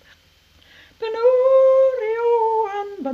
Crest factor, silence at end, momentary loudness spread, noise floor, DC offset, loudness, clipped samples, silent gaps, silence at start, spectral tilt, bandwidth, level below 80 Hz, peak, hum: 12 dB; 0 s; 13 LU; -55 dBFS; under 0.1%; -18 LUFS; under 0.1%; none; 1 s; -5 dB/octave; 6.4 kHz; -64 dBFS; -6 dBFS; none